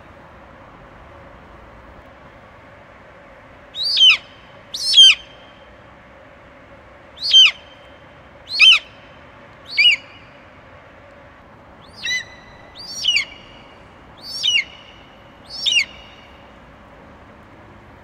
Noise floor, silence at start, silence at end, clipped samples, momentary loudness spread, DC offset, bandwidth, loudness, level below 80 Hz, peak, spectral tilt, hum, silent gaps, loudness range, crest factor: -44 dBFS; 3.75 s; 2.2 s; under 0.1%; 24 LU; under 0.1%; 16 kHz; -13 LUFS; -54 dBFS; 0 dBFS; 1 dB/octave; none; none; 11 LU; 20 dB